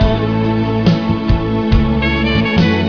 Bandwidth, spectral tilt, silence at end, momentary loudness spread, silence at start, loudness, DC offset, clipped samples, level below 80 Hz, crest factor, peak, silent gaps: 5.4 kHz; -8 dB/octave; 0 s; 3 LU; 0 s; -14 LUFS; 0.9%; under 0.1%; -22 dBFS; 12 dB; 0 dBFS; none